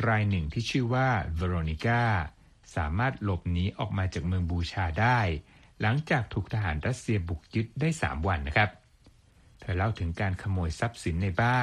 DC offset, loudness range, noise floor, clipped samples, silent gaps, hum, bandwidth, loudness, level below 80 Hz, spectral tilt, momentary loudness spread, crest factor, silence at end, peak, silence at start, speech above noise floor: under 0.1%; 2 LU; -59 dBFS; under 0.1%; none; none; 11 kHz; -29 LUFS; -42 dBFS; -6.5 dB/octave; 6 LU; 20 dB; 0 s; -8 dBFS; 0 s; 31 dB